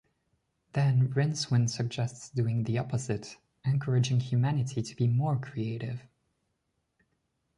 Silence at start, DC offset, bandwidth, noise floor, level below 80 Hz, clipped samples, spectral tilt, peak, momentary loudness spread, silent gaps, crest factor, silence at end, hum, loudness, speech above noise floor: 0.75 s; under 0.1%; 11 kHz; -79 dBFS; -62 dBFS; under 0.1%; -6.5 dB/octave; -16 dBFS; 9 LU; none; 16 dB; 1.55 s; none; -30 LUFS; 50 dB